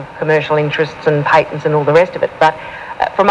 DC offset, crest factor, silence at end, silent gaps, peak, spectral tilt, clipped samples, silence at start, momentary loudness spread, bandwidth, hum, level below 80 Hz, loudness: under 0.1%; 14 dB; 0 s; none; 0 dBFS; -6.5 dB/octave; under 0.1%; 0 s; 7 LU; 9.4 kHz; none; -50 dBFS; -14 LUFS